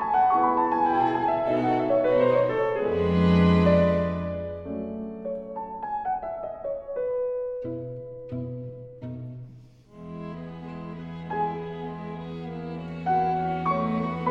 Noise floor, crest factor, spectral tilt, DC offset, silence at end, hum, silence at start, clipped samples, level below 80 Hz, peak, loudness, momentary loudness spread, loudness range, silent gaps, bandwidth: -49 dBFS; 16 dB; -9 dB/octave; under 0.1%; 0 s; none; 0 s; under 0.1%; -54 dBFS; -10 dBFS; -26 LUFS; 17 LU; 14 LU; none; 5.8 kHz